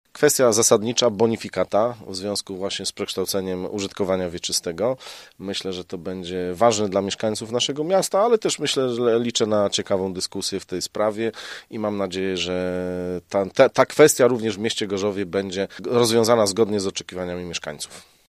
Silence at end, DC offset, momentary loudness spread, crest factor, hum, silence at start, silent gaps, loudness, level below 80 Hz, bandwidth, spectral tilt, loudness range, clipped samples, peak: 0.3 s; under 0.1%; 12 LU; 22 dB; none; 0.15 s; none; -22 LUFS; -60 dBFS; 15.5 kHz; -3.5 dB/octave; 6 LU; under 0.1%; 0 dBFS